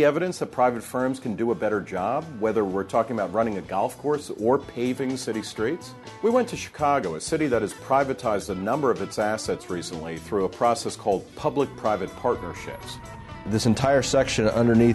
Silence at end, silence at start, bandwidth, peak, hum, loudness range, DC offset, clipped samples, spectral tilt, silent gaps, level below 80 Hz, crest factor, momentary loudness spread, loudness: 0 s; 0 s; 12.5 kHz; -8 dBFS; none; 2 LU; under 0.1%; under 0.1%; -5.5 dB/octave; none; -50 dBFS; 16 dB; 9 LU; -25 LUFS